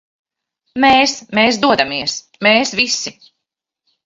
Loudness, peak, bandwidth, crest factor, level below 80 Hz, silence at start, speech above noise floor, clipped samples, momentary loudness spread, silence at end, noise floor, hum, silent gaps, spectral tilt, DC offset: -14 LUFS; 0 dBFS; 7.8 kHz; 16 dB; -52 dBFS; 0.75 s; 65 dB; under 0.1%; 10 LU; 0.95 s; -80 dBFS; none; none; -2.5 dB/octave; under 0.1%